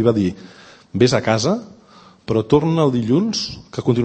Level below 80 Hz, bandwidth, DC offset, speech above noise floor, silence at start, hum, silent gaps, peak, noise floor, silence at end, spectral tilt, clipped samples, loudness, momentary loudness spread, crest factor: -48 dBFS; 8.8 kHz; under 0.1%; 29 dB; 0 s; none; none; 0 dBFS; -47 dBFS; 0 s; -6 dB/octave; under 0.1%; -18 LUFS; 11 LU; 18 dB